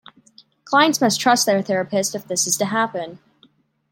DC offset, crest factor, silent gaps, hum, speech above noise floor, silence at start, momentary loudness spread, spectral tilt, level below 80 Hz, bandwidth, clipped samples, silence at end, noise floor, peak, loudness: under 0.1%; 20 dB; none; none; 39 dB; 0.65 s; 7 LU; -2.5 dB/octave; -70 dBFS; 17 kHz; under 0.1%; 0.75 s; -58 dBFS; -2 dBFS; -19 LUFS